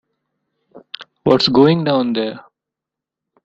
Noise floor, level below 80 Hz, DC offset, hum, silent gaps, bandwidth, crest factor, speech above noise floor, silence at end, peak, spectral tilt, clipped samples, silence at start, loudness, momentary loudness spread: -85 dBFS; -54 dBFS; under 0.1%; none; none; 7.8 kHz; 18 dB; 71 dB; 1.05 s; -2 dBFS; -7 dB/octave; under 0.1%; 0.75 s; -15 LUFS; 22 LU